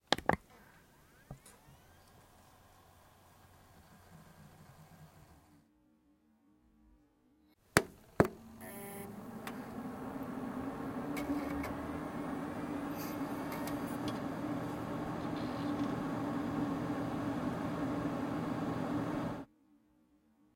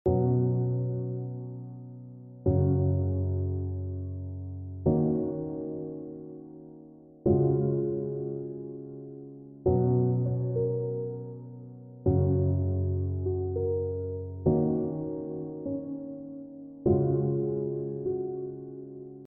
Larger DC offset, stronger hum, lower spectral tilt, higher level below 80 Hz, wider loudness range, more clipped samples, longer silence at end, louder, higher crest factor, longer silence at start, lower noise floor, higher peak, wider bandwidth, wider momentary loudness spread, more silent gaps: neither; neither; second, -5.5 dB/octave vs -13.5 dB/octave; second, -62 dBFS vs -50 dBFS; first, 22 LU vs 3 LU; neither; first, 1.1 s vs 0 s; second, -38 LUFS vs -30 LUFS; first, 38 dB vs 16 dB; about the same, 0.1 s vs 0.05 s; first, -70 dBFS vs -51 dBFS; first, -2 dBFS vs -12 dBFS; first, 16.5 kHz vs 1.6 kHz; first, 22 LU vs 18 LU; neither